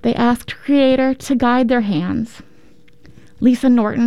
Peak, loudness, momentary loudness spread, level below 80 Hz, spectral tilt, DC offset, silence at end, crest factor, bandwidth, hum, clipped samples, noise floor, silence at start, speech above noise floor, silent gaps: -4 dBFS; -16 LUFS; 9 LU; -46 dBFS; -6 dB/octave; 2%; 0 s; 14 dB; 13 kHz; none; under 0.1%; -50 dBFS; 0.05 s; 35 dB; none